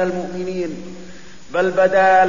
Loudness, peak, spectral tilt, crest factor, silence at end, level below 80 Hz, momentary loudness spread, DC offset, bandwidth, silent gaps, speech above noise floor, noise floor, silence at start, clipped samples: -19 LUFS; -4 dBFS; -5.5 dB/octave; 14 dB; 0 s; -52 dBFS; 23 LU; 2%; 7.4 kHz; none; 24 dB; -41 dBFS; 0 s; under 0.1%